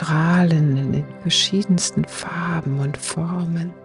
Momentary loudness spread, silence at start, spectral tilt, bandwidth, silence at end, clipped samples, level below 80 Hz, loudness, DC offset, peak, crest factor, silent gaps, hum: 8 LU; 0 s; -5 dB/octave; 11.5 kHz; 0 s; under 0.1%; -52 dBFS; -20 LUFS; under 0.1%; -6 dBFS; 14 dB; none; none